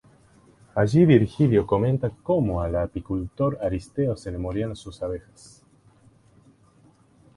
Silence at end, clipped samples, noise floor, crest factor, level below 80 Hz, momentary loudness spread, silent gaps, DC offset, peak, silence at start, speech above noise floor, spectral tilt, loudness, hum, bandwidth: 2.15 s; under 0.1%; -57 dBFS; 20 dB; -44 dBFS; 14 LU; none; under 0.1%; -4 dBFS; 0.75 s; 34 dB; -8.5 dB/octave; -24 LUFS; none; 11.5 kHz